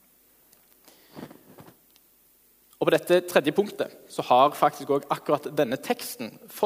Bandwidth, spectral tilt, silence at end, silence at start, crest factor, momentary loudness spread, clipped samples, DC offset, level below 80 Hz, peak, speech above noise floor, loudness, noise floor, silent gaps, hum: 16 kHz; -4.5 dB/octave; 0 s; 1.15 s; 24 dB; 18 LU; under 0.1%; under 0.1%; -74 dBFS; -2 dBFS; 36 dB; -25 LUFS; -61 dBFS; none; none